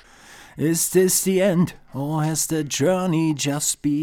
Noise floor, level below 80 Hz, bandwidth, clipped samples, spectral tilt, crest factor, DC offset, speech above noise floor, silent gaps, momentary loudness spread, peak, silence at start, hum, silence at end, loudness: -46 dBFS; -54 dBFS; over 20 kHz; under 0.1%; -4.5 dB/octave; 16 dB; under 0.1%; 25 dB; none; 8 LU; -6 dBFS; 0.3 s; none; 0 s; -21 LUFS